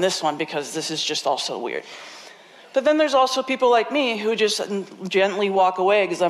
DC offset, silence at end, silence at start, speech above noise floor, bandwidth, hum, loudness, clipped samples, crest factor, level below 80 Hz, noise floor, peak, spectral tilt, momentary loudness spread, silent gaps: under 0.1%; 0 s; 0 s; 25 dB; 13.5 kHz; none; -21 LUFS; under 0.1%; 12 dB; -68 dBFS; -46 dBFS; -8 dBFS; -3 dB/octave; 11 LU; none